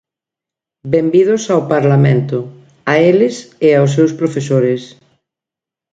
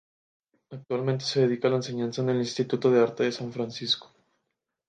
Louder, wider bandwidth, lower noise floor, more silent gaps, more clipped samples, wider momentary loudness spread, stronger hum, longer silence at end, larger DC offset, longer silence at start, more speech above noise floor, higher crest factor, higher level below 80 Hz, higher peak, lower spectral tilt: first, -13 LUFS vs -27 LUFS; about the same, 9 kHz vs 9.2 kHz; first, -86 dBFS vs -82 dBFS; neither; neither; about the same, 11 LU vs 10 LU; neither; first, 1.05 s vs 0.85 s; neither; first, 0.85 s vs 0.7 s; first, 74 dB vs 56 dB; about the same, 14 dB vs 18 dB; first, -56 dBFS vs -72 dBFS; first, 0 dBFS vs -10 dBFS; first, -7 dB/octave vs -5.5 dB/octave